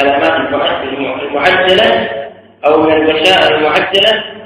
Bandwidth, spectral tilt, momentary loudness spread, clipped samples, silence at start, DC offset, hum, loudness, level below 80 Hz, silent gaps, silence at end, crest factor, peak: 14 kHz; -4 dB/octave; 10 LU; 0.5%; 0 s; under 0.1%; none; -10 LUFS; -46 dBFS; none; 0 s; 12 dB; 0 dBFS